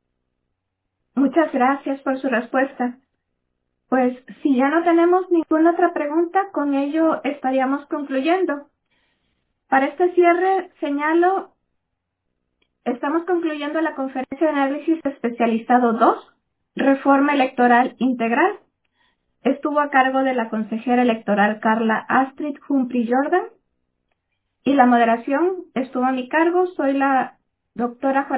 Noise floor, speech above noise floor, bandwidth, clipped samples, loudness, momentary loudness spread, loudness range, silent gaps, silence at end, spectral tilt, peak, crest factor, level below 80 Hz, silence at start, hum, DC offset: -77 dBFS; 58 dB; 4 kHz; under 0.1%; -20 LUFS; 9 LU; 4 LU; none; 0 s; -9 dB/octave; -2 dBFS; 18 dB; -70 dBFS; 1.15 s; none; under 0.1%